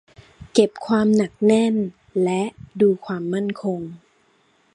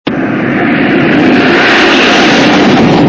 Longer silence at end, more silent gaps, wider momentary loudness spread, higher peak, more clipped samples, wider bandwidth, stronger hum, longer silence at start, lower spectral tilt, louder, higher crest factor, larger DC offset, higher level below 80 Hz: first, 0.75 s vs 0 s; neither; first, 9 LU vs 6 LU; about the same, -2 dBFS vs 0 dBFS; second, under 0.1% vs 2%; first, 10.5 kHz vs 8 kHz; neither; first, 0.4 s vs 0.05 s; first, -6.5 dB/octave vs -5 dB/octave; second, -21 LUFS vs -6 LUFS; first, 20 dB vs 6 dB; neither; second, -58 dBFS vs -36 dBFS